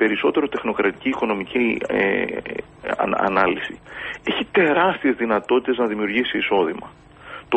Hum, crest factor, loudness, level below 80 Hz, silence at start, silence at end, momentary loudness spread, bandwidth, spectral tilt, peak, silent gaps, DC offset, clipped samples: none; 18 dB; -21 LUFS; -54 dBFS; 0 s; 0 s; 12 LU; 8.4 kHz; -6.5 dB/octave; -2 dBFS; none; under 0.1%; under 0.1%